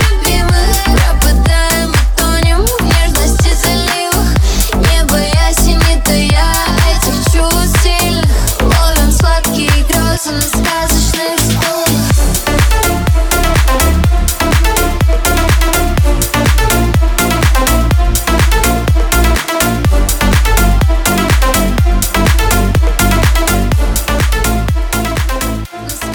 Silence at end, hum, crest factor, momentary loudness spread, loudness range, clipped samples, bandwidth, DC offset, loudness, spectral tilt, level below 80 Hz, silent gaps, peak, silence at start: 0 s; none; 10 dB; 2 LU; 1 LU; under 0.1%; over 20 kHz; under 0.1%; -11 LUFS; -4 dB/octave; -12 dBFS; none; 0 dBFS; 0 s